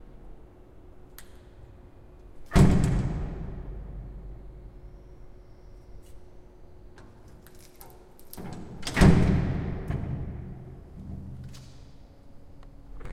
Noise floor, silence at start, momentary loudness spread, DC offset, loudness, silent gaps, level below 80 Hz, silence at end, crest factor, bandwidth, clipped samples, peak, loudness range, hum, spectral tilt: -49 dBFS; 0 s; 29 LU; under 0.1%; -26 LUFS; none; -36 dBFS; 0 s; 24 dB; 16 kHz; under 0.1%; -6 dBFS; 20 LU; none; -7 dB/octave